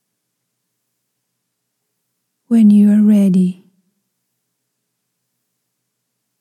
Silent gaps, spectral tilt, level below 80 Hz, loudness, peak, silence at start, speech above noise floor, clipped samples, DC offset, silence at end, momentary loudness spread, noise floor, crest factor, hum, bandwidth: none; -9 dB/octave; -88 dBFS; -12 LUFS; -2 dBFS; 2.5 s; 64 dB; under 0.1%; under 0.1%; 2.9 s; 8 LU; -73 dBFS; 14 dB; 60 Hz at -45 dBFS; 11 kHz